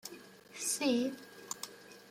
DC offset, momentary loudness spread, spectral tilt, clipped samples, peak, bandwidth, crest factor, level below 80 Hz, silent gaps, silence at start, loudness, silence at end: under 0.1%; 21 LU; -2 dB/octave; under 0.1%; -20 dBFS; 16.5 kHz; 18 dB; -82 dBFS; none; 0.05 s; -35 LUFS; 0 s